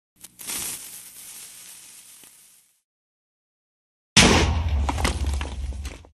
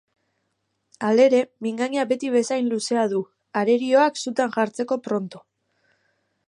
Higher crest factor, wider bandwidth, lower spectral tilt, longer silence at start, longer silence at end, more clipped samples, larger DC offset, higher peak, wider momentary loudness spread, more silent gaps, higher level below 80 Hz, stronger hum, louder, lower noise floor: first, 26 dB vs 18 dB; first, 14 kHz vs 11 kHz; second, -3 dB/octave vs -4.5 dB/octave; second, 0.4 s vs 1 s; second, 0.15 s vs 1.1 s; neither; neither; first, 0 dBFS vs -6 dBFS; first, 25 LU vs 10 LU; first, 2.84-4.16 s vs none; first, -32 dBFS vs -78 dBFS; first, 60 Hz at -55 dBFS vs none; about the same, -22 LUFS vs -22 LUFS; second, -55 dBFS vs -74 dBFS